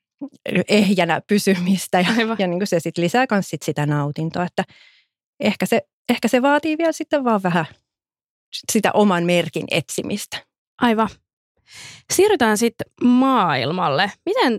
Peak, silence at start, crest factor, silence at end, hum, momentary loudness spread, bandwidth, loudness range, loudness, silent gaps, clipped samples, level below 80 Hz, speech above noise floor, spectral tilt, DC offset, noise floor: -4 dBFS; 0.2 s; 16 dB; 0 s; none; 10 LU; 16.5 kHz; 3 LU; -19 LUFS; 5.26-5.33 s, 5.93-6.05 s, 8.24-8.52 s, 10.58-10.78 s, 11.33-11.55 s; under 0.1%; -62 dBFS; 68 dB; -5 dB/octave; under 0.1%; -87 dBFS